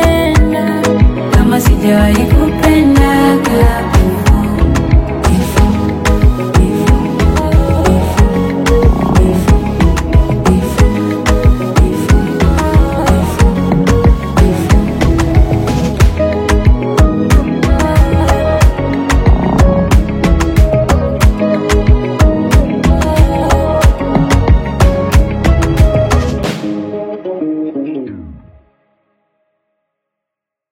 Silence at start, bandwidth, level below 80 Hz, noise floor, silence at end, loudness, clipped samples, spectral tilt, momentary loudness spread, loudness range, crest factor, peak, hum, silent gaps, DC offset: 0 s; 16.5 kHz; -14 dBFS; -81 dBFS; 2.35 s; -11 LUFS; 0.4%; -6.5 dB/octave; 3 LU; 4 LU; 10 dB; 0 dBFS; none; none; under 0.1%